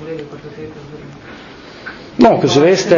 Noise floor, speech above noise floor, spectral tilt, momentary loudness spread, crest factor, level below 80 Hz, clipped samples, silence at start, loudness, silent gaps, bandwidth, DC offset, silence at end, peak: -35 dBFS; 23 dB; -5.5 dB/octave; 23 LU; 16 dB; -48 dBFS; under 0.1%; 0 s; -11 LUFS; none; 7.4 kHz; under 0.1%; 0 s; 0 dBFS